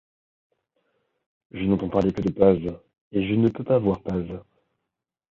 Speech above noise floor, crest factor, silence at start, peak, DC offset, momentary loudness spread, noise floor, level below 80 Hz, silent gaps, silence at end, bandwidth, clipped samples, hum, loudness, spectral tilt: 62 dB; 22 dB; 1.55 s; -4 dBFS; under 0.1%; 16 LU; -84 dBFS; -48 dBFS; 3.01-3.11 s; 0.9 s; 7 kHz; under 0.1%; none; -23 LUFS; -9.5 dB/octave